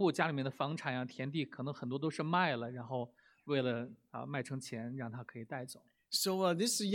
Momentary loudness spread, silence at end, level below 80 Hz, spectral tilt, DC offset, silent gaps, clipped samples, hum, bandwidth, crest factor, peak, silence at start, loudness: 13 LU; 0 s; -84 dBFS; -4.5 dB/octave; under 0.1%; none; under 0.1%; none; 17.5 kHz; 22 dB; -16 dBFS; 0 s; -37 LUFS